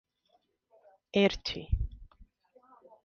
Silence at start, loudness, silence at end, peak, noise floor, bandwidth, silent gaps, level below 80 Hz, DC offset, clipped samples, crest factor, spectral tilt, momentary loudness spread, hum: 1.15 s; -31 LUFS; 0.8 s; -10 dBFS; -73 dBFS; 7 kHz; none; -42 dBFS; under 0.1%; under 0.1%; 24 dB; -6 dB/octave; 9 LU; none